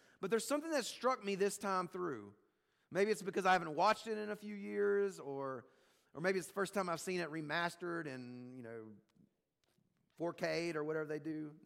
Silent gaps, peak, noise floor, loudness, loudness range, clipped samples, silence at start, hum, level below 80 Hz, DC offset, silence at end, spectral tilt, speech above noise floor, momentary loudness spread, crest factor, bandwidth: none; -22 dBFS; -82 dBFS; -39 LUFS; 7 LU; under 0.1%; 0.2 s; none; -84 dBFS; under 0.1%; 0.05 s; -4.5 dB/octave; 44 dB; 16 LU; 18 dB; 16 kHz